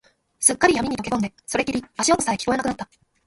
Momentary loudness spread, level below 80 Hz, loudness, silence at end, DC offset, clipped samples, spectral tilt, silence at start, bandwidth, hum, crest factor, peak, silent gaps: 9 LU; -50 dBFS; -21 LUFS; 0.4 s; under 0.1%; under 0.1%; -3 dB/octave; 0.4 s; 12 kHz; none; 22 dB; 0 dBFS; none